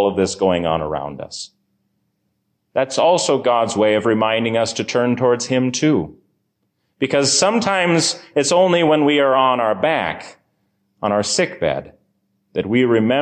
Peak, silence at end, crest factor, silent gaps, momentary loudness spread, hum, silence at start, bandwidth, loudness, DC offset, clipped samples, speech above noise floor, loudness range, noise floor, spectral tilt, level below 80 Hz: -4 dBFS; 0 s; 14 dB; none; 11 LU; none; 0 s; 9.8 kHz; -17 LUFS; under 0.1%; under 0.1%; 53 dB; 5 LU; -70 dBFS; -4 dB/octave; -50 dBFS